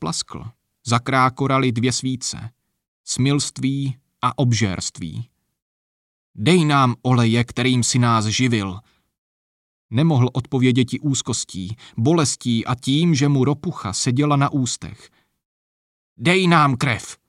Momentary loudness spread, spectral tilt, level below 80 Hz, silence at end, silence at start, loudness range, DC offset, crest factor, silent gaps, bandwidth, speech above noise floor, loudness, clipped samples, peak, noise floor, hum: 13 LU; -5 dB/octave; -54 dBFS; 0.15 s; 0 s; 4 LU; under 0.1%; 18 dB; 2.88-3.04 s, 5.62-6.34 s, 9.18-9.89 s, 15.45-16.16 s; 12 kHz; over 71 dB; -19 LUFS; under 0.1%; -4 dBFS; under -90 dBFS; none